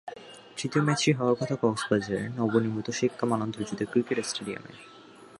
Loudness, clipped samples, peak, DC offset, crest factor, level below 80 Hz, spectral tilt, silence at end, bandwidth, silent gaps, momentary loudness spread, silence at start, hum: -28 LUFS; under 0.1%; -10 dBFS; under 0.1%; 20 dB; -64 dBFS; -5 dB/octave; 0.05 s; 11.5 kHz; none; 16 LU; 0.05 s; none